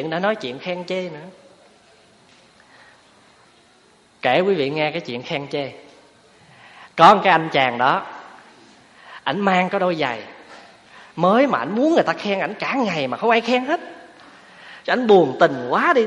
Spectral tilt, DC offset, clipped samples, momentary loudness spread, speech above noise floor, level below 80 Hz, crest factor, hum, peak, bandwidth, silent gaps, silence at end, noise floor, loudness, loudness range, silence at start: -5.5 dB/octave; under 0.1%; under 0.1%; 18 LU; 36 dB; -66 dBFS; 20 dB; none; 0 dBFS; 11 kHz; none; 0 s; -54 dBFS; -19 LUFS; 9 LU; 0 s